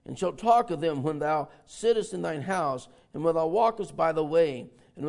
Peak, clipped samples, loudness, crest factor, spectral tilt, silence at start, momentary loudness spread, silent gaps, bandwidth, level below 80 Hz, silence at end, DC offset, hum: -10 dBFS; under 0.1%; -27 LUFS; 18 dB; -6 dB/octave; 0.1 s; 9 LU; none; 11 kHz; -60 dBFS; 0 s; under 0.1%; none